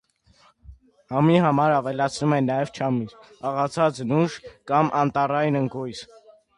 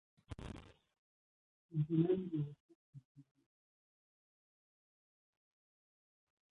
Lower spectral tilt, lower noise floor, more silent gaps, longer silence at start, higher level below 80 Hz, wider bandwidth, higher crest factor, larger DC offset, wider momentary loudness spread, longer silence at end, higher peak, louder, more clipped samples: second, -7 dB/octave vs -10 dB/octave; second, -59 dBFS vs under -90 dBFS; second, none vs 0.98-1.69 s, 2.60-2.69 s, 2.75-2.93 s, 3.05-3.15 s; first, 0.7 s vs 0.3 s; first, -58 dBFS vs -68 dBFS; first, 11 kHz vs 6.8 kHz; about the same, 18 dB vs 22 dB; neither; second, 13 LU vs 21 LU; second, 0.55 s vs 3.35 s; first, -4 dBFS vs -22 dBFS; first, -23 LUFS vs -39 LUFS; neither